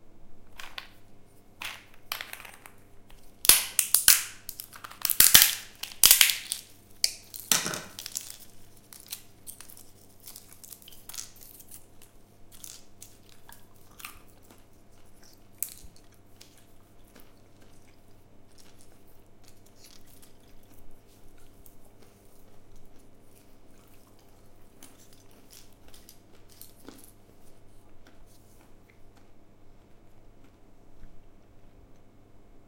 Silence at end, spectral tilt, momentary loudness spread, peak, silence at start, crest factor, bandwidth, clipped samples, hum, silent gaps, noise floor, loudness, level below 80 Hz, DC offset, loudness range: 0.1 s; 1.5 dB/octave; 30 LU; 0 dBFS; 0.05 s; 32 dB; 17 kHz; under 0.1%; none; none; -52 dBFS; -22 LUFS; -56 dBFS; under 0.1%; 26 LU